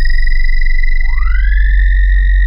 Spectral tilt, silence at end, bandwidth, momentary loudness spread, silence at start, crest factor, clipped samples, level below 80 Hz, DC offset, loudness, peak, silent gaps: -5 dB/octave; 0 s; 5.4 kHz; 4 LU; 0 s; 6 dB; under 0.1%; -8 dBFS; under 0.1%; -15 LUFS; -2 dBFS; none